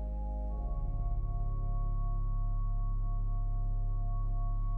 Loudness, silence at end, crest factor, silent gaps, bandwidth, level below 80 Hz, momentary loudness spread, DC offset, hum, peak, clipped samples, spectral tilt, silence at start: -38 LUFS; 0 s; 8 dB; none; 1.2 kHz; -32 dBFS; 1 LU; under 0.1%; none; -24 dBFS; under 0.1%; -12 dB/octave; 0 s